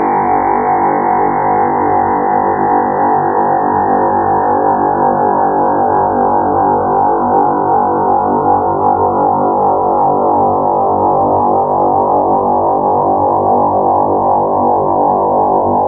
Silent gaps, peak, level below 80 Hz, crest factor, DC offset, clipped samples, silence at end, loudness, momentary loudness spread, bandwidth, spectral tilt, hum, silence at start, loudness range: none; 0 dBFS; -44 dBFS; 10 dB; under 0.1%; under 0.1%; 0 s; -12 LUFS; 1 LU; 2.5 kHz; -15 dB/octave; 50 Hz at -40 dBFS; 0 s; 1 LU